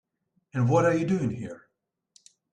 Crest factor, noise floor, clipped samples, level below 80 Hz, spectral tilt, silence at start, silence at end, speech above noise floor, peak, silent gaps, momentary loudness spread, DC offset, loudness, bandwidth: 18 dB; -74 dBFS; under 0.1%; -62 dBFS; -7.5 dB/octave; 0.55 s; 0.95 s; 50 dB; -10 dBFS; none; 17 LU; under 0.1%; -25 LUFS; 9.4 kHz